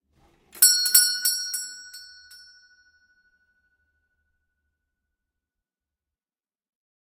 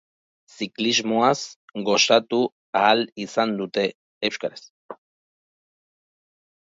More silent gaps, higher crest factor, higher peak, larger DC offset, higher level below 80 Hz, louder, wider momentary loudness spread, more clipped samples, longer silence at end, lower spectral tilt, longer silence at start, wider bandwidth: second, none vs 1.56-1.68 s, 2.52-2.73 s, 3.12-3.16 s, 3.95-4.21 s, 4.70-4.89 s; first, 28 dB vs 22 dB; about the same, 0 dBFS vs -2 dBFS; neither; about the same, -76 dBFS vs -72 dBFS; first, -18 LUFS vs -22 LUFS; first, 22 LU vs 14 LU; neither; first, 5.05 s vs 1.7 s; second, 5.5 dB/octave vs -3 dB/octave; about the same, 0.55 s vs 0.6 s; first, 15.5 kHz vs 7.8 kHz